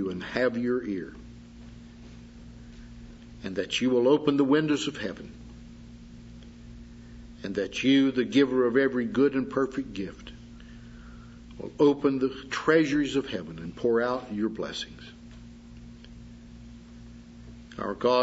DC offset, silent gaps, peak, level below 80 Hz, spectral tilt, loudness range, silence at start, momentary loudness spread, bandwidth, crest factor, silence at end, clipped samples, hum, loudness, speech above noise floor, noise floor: under 0.1%; none; -10 dBFS; -52 dBFS; -5.5 dB/octave; 11 LU; 0 s; 25 LU; 8 kHz; 18 dB; 0 s; under 0.1%; none; -26 LUFS; 21 dB; -47 dBFS